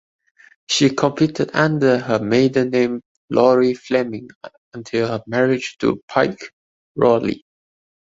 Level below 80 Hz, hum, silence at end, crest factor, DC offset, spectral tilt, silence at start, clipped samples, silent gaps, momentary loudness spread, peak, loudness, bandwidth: -56 dBFS; none; 0.65 s; 18 dB; under 0.1%; -5.5 dB/octave; 0.7 s; under 0.1%; 3.05-3.28 s, 4.35-4.41 s, 4.58-4.72 s, 6.03-6.08 s, 6.53-6.95 s; 17 LU; -2 dBFS; -18 LUFS; 8 kHz